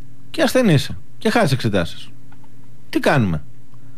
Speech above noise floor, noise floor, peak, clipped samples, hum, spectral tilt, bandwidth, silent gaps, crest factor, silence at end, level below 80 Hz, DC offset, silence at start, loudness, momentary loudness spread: 29 dB; -46 dBFS; -6 dBFS; under 0.1%; none; -6 dB/octave; 15.5 kHz; none; 16 dB; 0.55 s; -46 dBFS; 6%; 0.35 s; -19 LUFS; 13 LU